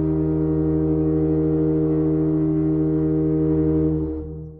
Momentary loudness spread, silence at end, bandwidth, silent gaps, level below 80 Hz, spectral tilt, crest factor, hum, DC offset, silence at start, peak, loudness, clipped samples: 1 LU; 0 s; 2.5 kHz; none; -34 dBFS; -14.5 dB/octave; 8 dB; none; under 0.1%; 0 s; -10 dBFS; -21 LUFS; under 0.1%